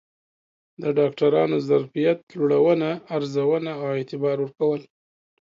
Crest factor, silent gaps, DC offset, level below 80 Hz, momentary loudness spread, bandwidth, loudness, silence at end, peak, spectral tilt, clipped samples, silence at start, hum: 16 dB; 2.23-2.27 s; under 0.1%; -72 dBFS; 8 LU; 7.4 kHz; -23 LUFS; 0.75 s; -6 dBFS; -8 dB/octave; under 0.1%; 0.8 s; none